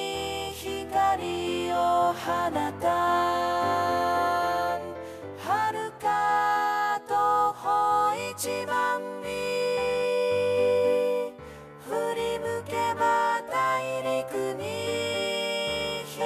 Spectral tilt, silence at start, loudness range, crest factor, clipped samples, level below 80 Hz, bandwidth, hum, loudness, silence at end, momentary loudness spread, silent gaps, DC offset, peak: -3.5 dB/octave; 0 s; 2 LU; 14 dB; under 0.1%; -58 dBFS; 15.5 kHz; none; -27 LUFS; 0 s; 8 LU; none; under 0.1%; -12 dBFS